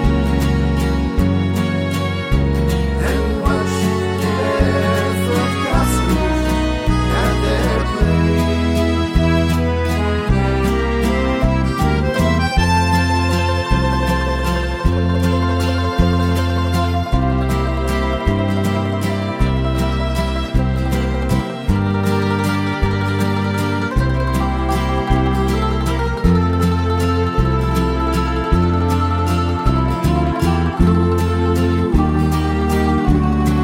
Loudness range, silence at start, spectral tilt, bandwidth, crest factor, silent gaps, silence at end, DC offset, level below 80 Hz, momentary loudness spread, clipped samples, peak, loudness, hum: 2 LU; 0 s; -6.5 dB/octave; 16.5 kHz; 14 dB; none; 0 s; under 0.1%; -22 dBFS; 3 LU; under 0.1%; -2 dBFS; -17 LUFS; none